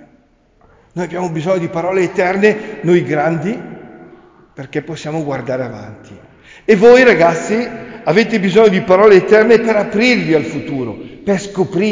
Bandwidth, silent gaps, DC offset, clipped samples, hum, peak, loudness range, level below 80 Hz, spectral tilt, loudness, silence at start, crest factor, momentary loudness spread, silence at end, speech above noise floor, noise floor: 7.6 kHz; none; under 0.1%; under 0.1%; none; 0 dBFS; 9 LU; -50 dBFS; -6 dB/octave; -13 LUFS; 0.95 s; 14 dB; 17 LU; 0 s; 39 dB; -52 dBFS